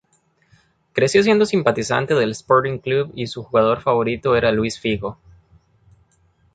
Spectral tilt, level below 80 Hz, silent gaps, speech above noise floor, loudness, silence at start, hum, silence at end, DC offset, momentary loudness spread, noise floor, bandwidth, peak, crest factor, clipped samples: -5.5 dB/octave; -50 dBFS; none; 44 dB; -19 LUFS; 0.95 s; none; 1.4 s; under 0.1%; 9 LU; -62 dBFS; 9.4 kHz; -2 dBFS; 18 dB; under 0.1%